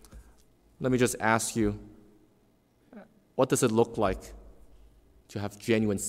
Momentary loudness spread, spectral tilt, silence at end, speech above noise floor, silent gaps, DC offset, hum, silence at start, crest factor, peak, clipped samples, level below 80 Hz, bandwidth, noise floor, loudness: 14 LU; -5 dB/octave; 0 s; 38 dB; none; under 0.1%; none; 0.15 s; 22 dB; -10 dBFS; under 0.1%; -52 dBFS; 16 kHz; -65 dBFS; -28 LUFS